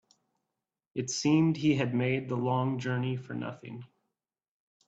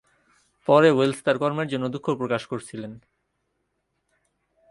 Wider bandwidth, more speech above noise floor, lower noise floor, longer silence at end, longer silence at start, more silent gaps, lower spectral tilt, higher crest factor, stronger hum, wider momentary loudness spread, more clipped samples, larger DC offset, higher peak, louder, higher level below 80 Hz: second, 8 kHz vs 11.5 kHz; first, 58 dB vs 53 dB; first, -87 dBFS vs -75 dBFS; second, 1 s vs 1.75 s; first, 0.95 s vs 0.7 s; neither; about the same, -6 dB/octave vs -6 dB/octave; about the same, 18 dB vs 22 dB; neither; second, 15 LU vs 18 LU; neither; neither; second, -14 dBFS vs -4 dBFS; second, -30 LUFS vs -23 LUFS; about the same, -70 dBFS vs -66 dBFS